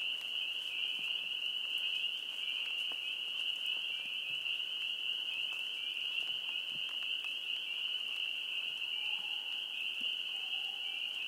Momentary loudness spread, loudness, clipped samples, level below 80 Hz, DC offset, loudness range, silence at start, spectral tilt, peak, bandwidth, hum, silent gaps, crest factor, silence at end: 2 LU; -35 LUFS; under 0.1%; under -90 dBFS; under 0.1%; 1 LU; 0 s; 1.5 dB/octave; -24 dBFS; 16.5 kHz; none; none; 14 dB; 0 s